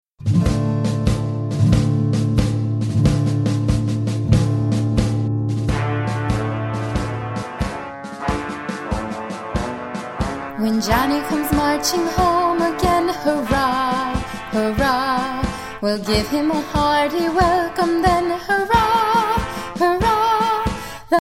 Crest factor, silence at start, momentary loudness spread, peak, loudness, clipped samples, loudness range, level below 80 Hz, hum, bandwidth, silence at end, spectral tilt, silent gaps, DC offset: 16 dB; 0.2 s; 9 LU; -2 dBFS; -19 LUFS; under 0.1%; 7 LU; -32 dBFS; none; 16.5 kHz; 0 s; -6 dB/octave; none; under 0.1%